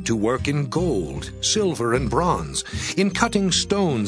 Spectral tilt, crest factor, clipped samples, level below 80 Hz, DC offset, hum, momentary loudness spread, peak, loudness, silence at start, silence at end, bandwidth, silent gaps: -4.5 dB/octave; 20 dB; under 0.1%; -38 dBFS; under 0.1%; none; 6 LU; -2 dBFS; -22 LUFS; 0 s; 0 s; 11 kHz; none